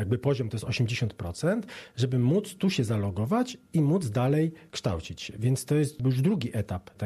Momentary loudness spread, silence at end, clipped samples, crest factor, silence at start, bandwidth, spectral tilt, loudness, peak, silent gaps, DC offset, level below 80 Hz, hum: 7 LU; 0 s; under 0.1%; 14 dB; 0 s; 13.5 kHz; -6.5 dB/octave; -28 LUFS; -12 dBFS; none; under 0.1%; -58 dBFS; none